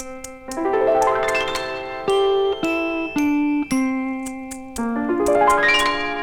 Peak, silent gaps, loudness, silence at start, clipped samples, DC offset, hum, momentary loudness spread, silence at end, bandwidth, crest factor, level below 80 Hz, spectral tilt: -6 dBFS; none; -20 LUFS; 0 s; under 0.1%; under 0.1%; none; 13 LU; 0 s; 19 kHz; 14 dB; -46 dBFS; -3.5 dB/octave